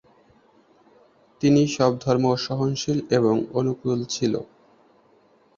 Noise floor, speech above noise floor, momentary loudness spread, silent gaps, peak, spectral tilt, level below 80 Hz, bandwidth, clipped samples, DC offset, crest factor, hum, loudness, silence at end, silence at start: -59 dBFS; 37 dB; 7 LU; none; -6 dBFS; -6 dB/octave; -60 dBFS; 7.6 kHz; under 0.1%; under 0.1%; 20 dB; none; -23 LUFS; 1.15 s; 1.4 s